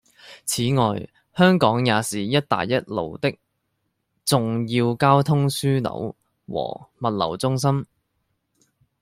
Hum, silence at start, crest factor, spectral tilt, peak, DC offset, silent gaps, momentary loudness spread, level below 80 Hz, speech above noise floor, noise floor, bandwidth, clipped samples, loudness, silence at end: none; 0.25 s; 20 dB; -5.5 dB/octave; -2 dBFS; under 0.1%; none; 14 LU; -58 dBFS; 53 dB; -74 dBFS; 16 kHz; under 0.1%; -22 LUFS; 1.2 s